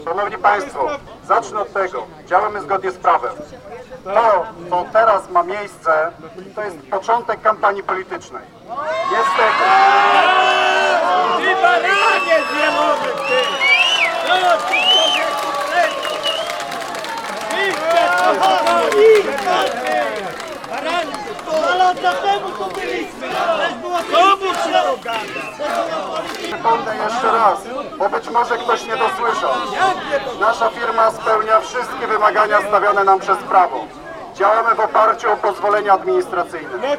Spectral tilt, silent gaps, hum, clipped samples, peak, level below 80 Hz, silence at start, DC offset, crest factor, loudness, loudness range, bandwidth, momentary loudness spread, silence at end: -2.5 dB/octave; none; none; under 0.1%; 0 dBFS; -54 dBFS; 0 s; under 0.1%; 16 dB; -16 LUFS; 5 LU; 17 kHz; 12 LU; 0 s